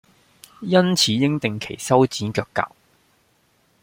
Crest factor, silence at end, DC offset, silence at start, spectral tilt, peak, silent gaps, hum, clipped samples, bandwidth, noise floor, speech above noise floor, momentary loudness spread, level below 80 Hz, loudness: 20 dB; 1.15 s; under 0.1%; 0.6 s; -4.5 dB/octave; -2 dBFS; none; none; under 0.1%; 16.5 kHz; -62 dBFS; 43 dB; 11 LU; -60 dBFS; -20 LUFS